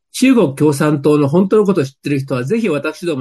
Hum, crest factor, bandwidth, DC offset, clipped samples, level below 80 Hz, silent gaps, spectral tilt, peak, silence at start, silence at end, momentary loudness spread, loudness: none; 12 dB; 12.5 kHz; under 0.1%; under 0.1%; -58 dBFS; none; -6.5 dB/octave; -2 dBFS; 0.15 s; 0 s; 7 LU; -14 LUFS